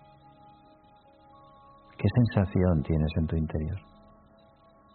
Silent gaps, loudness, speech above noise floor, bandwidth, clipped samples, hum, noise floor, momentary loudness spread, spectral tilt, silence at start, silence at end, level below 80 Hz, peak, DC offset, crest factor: none; -27 LUFS; 32 dB; 4.5 kHz; under 0.1%; none; -58 dBFS; 11 LU; -8.5 dB/octave; 2 s; 1.15 s; -42 dBFS; -10 dBFS; under 0.1%; 20 dB